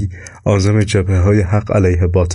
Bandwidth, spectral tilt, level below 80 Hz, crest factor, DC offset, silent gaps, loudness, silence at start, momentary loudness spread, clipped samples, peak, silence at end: 11 kHz; -7 dB/octave; -30 dBFS; 10 dB; under 0.1%; none; -14 LUFS; 0 s; 4 LU; under 0.1%; -4 dBFS; 0 s